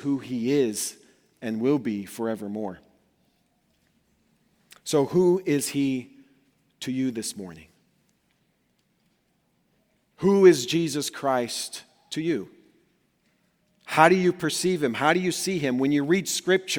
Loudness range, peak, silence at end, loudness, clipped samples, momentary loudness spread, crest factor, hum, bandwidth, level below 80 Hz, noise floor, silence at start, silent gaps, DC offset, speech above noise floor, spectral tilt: 12 LU; -2 dBFS; 0 s; -24 LUFS; under 0.1%; 15 LU; 26 dB; none; 19.5 kHz; -68 dBFS; -70 dBFS; 0 s; none; under 0.1%; 46 dB; -4.5 dB/octave